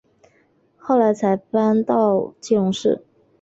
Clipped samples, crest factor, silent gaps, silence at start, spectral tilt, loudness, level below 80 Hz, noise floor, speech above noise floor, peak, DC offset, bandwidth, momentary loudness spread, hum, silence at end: under 0.1%; 16 dB; none; 0.85 s; -6.5 dB/octave; -19 LUFS; -64 dBFS; -60 dBFS; 42 dB; -4 dBFS; under 0.1%; 8 kHz; 5 LU; none; 0.45 s